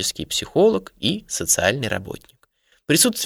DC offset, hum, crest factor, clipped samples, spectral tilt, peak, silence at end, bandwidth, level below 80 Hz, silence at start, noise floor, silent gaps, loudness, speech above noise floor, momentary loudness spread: under 0.1%; none; 20 dB; under 0.1%; -3 dB/octave; -2 dBFS; 0 s; 20 kHz; -50 dBFS; 0 s; -62 dBFS; none; -20 LUFS; 41 dB; 16 LU